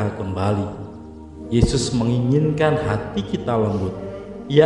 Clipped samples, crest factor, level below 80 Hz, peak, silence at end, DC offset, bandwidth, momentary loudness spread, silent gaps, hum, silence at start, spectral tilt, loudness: under 0.1%; 20 dB; -36 dBFS; 0 dBFS; 0 s; under 0.1%; 11 kHz; 16 LU; none; none; 0 s; -6.5 dB/octave; -21 LUFS